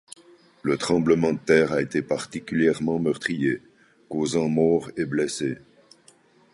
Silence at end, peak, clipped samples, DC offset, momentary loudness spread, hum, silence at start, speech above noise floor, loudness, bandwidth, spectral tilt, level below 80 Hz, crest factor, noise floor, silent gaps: 0.95 s; -4 dBFS; under 0.1%; under 0.1%; 9 LU; none; 0.65 s; 34 dB; -24 LUFS; 11.5 kHz; -5.5 dB/octave; -58 dBFS; 20 dB; -57 dBFS; none